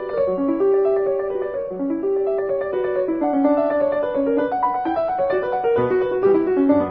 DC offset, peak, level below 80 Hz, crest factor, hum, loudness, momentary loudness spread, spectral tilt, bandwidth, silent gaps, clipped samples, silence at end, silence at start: under 0.1%; -6 dBFS; -54 dBFS; 14 dB; none; -20 LUFS; 5 LU; -10 dB/octave; 4.8 kHz; none; under 0.1%; 0 s; 0 s